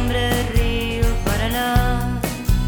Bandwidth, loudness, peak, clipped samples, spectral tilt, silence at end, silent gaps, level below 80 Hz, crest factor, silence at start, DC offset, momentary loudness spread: over 20 kHz; -21 LUFS; -4 dBFS; under 0.1%; -5 dB/octave; 0 s; none; -22 dBFS; 14 dB; 0 s; under 0.1%; 3 LU